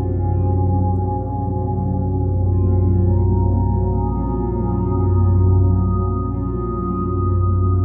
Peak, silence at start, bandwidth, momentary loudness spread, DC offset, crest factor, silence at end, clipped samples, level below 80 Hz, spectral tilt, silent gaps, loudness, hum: -4 dBFS; 0 s; 1.8 kHz; 6 LU; under 0.1%; 12 dB; 0 s; under 0.1%; -26 dBFS; -15 dB/octave; none; -19 LUFS; none